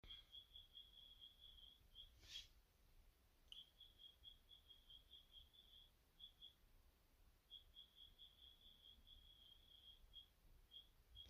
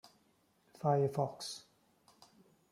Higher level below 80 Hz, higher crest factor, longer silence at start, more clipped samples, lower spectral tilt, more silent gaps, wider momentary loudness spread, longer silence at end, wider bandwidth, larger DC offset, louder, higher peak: first, -74 dBFS vs -80 dBFS; about the same, 24 dB vs 20 dB; about the same, 0.05 s vs 0.05 s; neither; second, -2 dB/octave vs -6 dB/octave; neither; second, 7 LU vs 13 LU; second, 0 s vs 1.1 s; about the same, 15.5 kHz vs 14.5 kHz; neither; second, -64 LUFS vs -36 LUFS; second, -44 dBFS vs -18 dBFS